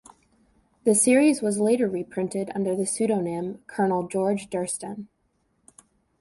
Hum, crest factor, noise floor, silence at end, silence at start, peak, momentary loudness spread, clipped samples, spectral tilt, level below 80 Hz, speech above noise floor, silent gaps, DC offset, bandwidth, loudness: none; 18 dB; -70 dBFS; 1.15 s; 0.85 s; -8 dBFS; 13 LU; under 0.1%; -5 dB/octave; -66 dBFS; 46 dB; none; under 0.1%; 12 kHz; -24 LUFS